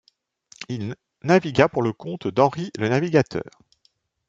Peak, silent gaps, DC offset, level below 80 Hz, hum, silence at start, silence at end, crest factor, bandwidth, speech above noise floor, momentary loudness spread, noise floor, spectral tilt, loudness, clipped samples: -2 dBFS; none; under 0.1%; -60 dBFS; none; 0.6 s; 0.8 s; 22 dB; 7.8 kHz; 45 dB; 14 LU; -66 dBFS; -6.5 dB/octave; -22 LUFS; under 0.1%